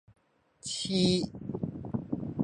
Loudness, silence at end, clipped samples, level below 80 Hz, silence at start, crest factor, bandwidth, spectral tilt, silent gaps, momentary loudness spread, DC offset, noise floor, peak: -32 LUFS; 0 s; under 0.1%; -56 dBFS; 0.1 s; 18 dB; 10.5 kHz; -5 dB/octave; none; 11 LU; under 0.1%; -56 dBFS; -14 dBFS